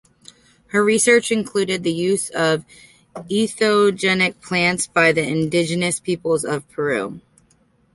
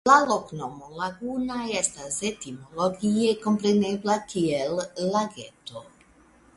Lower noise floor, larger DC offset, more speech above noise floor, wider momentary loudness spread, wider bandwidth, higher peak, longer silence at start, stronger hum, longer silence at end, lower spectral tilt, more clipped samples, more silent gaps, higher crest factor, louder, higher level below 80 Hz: about the same, -59 dBFS vs -57 dBFS; neither; first, 40 dB vs 31 dB; second, 9 LU vs 15 LU; about the same, 12 kHz vs 11.5 kHz; about the same, -2 dBFS vs -4 dBFS; first, 0.75 s vs 0.05 s; neither; about the same, 0.75 s vs 0.75 s; about the same, -4 dB/octave vs -4.5 dB/octave; neither; neither; about the same, 18 dB vs 22 dB; first, -19 LUFS vs -26 LUFS; about the same, -58 dBFS vs -62 dBFS